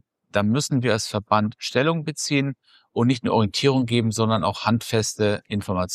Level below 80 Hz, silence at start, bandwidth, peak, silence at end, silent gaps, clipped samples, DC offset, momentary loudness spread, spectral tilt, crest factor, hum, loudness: -56 dBFS; 0.35 s; 14.5 kHz; -4 dBFS; 0 s; none; under 0.1%; under 0.1%; 6 LU; -5 dB/octave; 18 dB; none; -22 LUFS